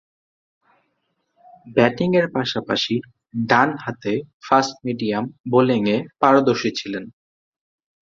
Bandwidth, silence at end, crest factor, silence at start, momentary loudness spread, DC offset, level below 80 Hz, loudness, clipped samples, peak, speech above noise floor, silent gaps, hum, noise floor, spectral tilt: 7.6 kHz; 1 s; 20 dB; 1.65 s; 11 LU; under 0.1%; -60 dBFS; -20 LUFS; under 0.1%; -2 dBFS; 52 dB; 4.34-4.40 s, 5.40-5.44 s; none; -72 dBFS; -5.5 dB/octave